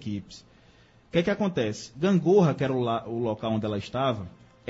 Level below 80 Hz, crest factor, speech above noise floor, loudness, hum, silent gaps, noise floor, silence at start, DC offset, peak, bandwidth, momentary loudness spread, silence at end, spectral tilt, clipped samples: -58 dBFS; 18 dB; 31 dB; -26 LUFS; none; none; -57 dBFS; 0 s; under 0.1%; -10 dBFS; 8 kHz; 14 LU; 0.4 s; -7 dB/octave; under 0.1%